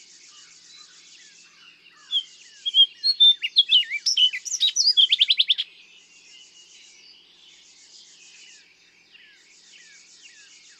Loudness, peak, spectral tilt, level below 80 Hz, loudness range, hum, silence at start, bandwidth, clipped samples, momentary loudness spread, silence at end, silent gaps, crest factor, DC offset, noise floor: -18 LUFS; -6 dBFS; 5.5 dB/octave; -88 dBFS; 8 LU; none; 2.1 s; 13 kHz; under 0.1%; 11 LU; 5.15 s; none; 20 dB; under 0.1%; -56 dBFS